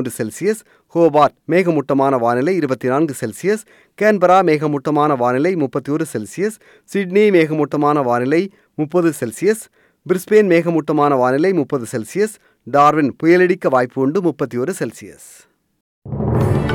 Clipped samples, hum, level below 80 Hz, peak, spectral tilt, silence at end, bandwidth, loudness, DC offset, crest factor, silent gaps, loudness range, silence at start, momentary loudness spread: under 0.1%; none; -46 dBFS; -2 dBFS; -6.5 dB/octave; 0 s; 17 kHz; -16 LUFS; under 0.1%; 14 dB; 15.81-16.02 s; 2 LU; 0 s; 11 LU